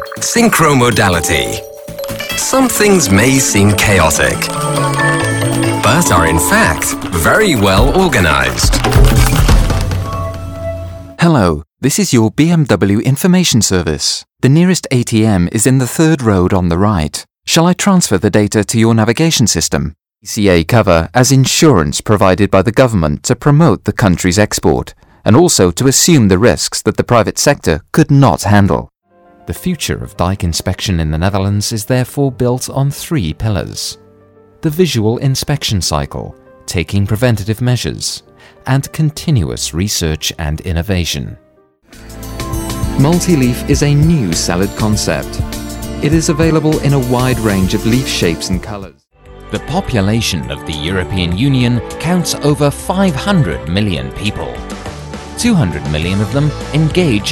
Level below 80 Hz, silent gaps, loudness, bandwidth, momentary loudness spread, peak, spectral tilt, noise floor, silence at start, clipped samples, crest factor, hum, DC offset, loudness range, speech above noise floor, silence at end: -26 dBFS; none; -12 LUFS; 19.5 kHz; 11 LU; 0 dBFS; -5 dB/octave; -50 dBFS; 0 s; 0.1%; 12 dB; none; under 0.1%; 6 LU; 38 dB; 0 s